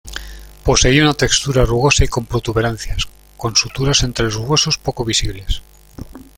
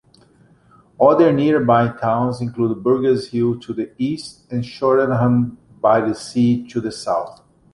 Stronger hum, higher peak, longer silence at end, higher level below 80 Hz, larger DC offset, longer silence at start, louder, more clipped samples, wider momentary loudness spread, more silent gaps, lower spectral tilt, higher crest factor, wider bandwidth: neither; about the same, 0 dBFS vs -2 dBFS; second, 0.15 s vs 0.45 s; first, -26 dBFS vs -54 dBFS; neither; second, 0.05 s vs 1 s; about the same, -16 LUFS vs -18 LUFS; neither; first, 14 LU vs 11 LU; neither; second, -3.5 dB/octave vs -7.5 dB/octave; about the same, 16 dB vs 16 dB; first, 17 kHz vs 11.5 kHz